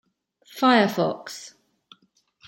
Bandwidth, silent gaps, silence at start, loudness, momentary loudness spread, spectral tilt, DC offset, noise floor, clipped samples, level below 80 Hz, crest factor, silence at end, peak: 17 kHz; none; 0.55 s; -21 LUFS; 24 LU; -5 dB/octave; under 0.1%; -65 dBFS; under 0.1%; -76 dBFS; 20 dB; 1 s; -6 dBFS